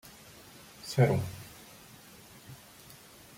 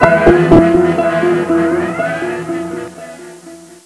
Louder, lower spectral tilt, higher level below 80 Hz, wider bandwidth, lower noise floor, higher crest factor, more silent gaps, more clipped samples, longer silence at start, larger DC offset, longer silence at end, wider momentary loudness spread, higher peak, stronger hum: second, -30 LUFS vs -12 LUFS; about the same, -6.5 dB/octave vs -7 dB/octave; second, -64 dBFS vs -32 dBFS; first, 16.5 kHz vs 11 kHz; first, -53 dBFS vs -36 dBFS; first, 24 dB vs 12 dB; neither; second, under 0.1% vs 0.2%; about the same, 0.05 s vs 0 s; neither; first, 0.8 s vs 0.1 s; about the same, 24 LU vs 22 LU; second, -12 dBFS vs 0 dBFS; neither